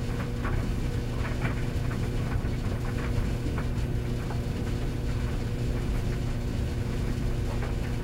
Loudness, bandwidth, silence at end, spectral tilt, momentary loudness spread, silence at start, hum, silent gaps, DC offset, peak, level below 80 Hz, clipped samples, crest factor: -31 LUFS; 16 kHz; 0 s; -7 dB/octave; 1 LU; 0 s; none; none; under 0.1%; -16 dBFS; -32 dBFS; under 0.1%; 14 dB